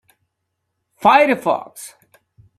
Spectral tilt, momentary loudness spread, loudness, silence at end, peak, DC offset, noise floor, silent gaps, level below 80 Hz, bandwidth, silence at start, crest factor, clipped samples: -4 dB/octave; 23 LU; -16 LUFS; 0.7 s; -2 dBFS; under 0.1%; -75 dBFS; none; -64 dBFS; 14 kHz; 1 s; 18 dB; under 0.1%